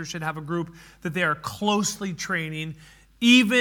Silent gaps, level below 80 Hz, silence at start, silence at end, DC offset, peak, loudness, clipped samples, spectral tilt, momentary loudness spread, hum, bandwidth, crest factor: none; -58 dBFS; 0 s; 0 s; under 0.1%; -6 dBFS; -24 LUFS; under 0.1%; -3.5 dB/octave; 16 LU; none; 18.5 kHz; 18 dB